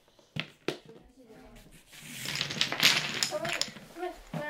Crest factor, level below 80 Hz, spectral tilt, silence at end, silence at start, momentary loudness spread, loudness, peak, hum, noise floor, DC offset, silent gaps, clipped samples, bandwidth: 30 dB; -64 dBFS; -1.5 dB/octave; 0 s; 0.35 s; 17 LU; -30 LUFS; -4 dBFS; none; -54 dBFS; under 0.1%; none; under 0.1%; 18 kHz